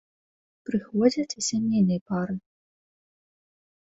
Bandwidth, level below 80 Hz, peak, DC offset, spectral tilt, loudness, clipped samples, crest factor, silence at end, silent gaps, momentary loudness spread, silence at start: 8 kHz; -64 dBFS; -8 dBFS; under 0.1%; -5.5 dB/octave; -26 LUFS; under 0.1%; 20 dB; 1.4 s; 2.01-2.06 s; 10 LU; 0.7 s